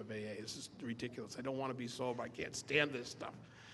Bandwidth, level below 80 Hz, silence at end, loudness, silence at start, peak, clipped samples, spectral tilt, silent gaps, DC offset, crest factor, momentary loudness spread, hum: 12 kHz; -74 dBFS; 0 s; -41 LUFS; 0 s; -18 dBFS; under 0.1%; -4 dB/octave; none; under 0.1%; 24 dB; 12 LU; none